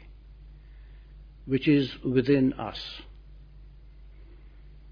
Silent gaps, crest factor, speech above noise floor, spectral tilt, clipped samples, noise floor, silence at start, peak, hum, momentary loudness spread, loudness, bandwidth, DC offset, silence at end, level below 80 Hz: none; 20 dB; 23 dB; -8.5 dB/octave; under 0.1%; -49 dBFS; 0.05 s; -12 dBFS; none; 21 LU; -26 LUFS; 5.2 kHz; under 0.1%; 0 s; -48 dBFS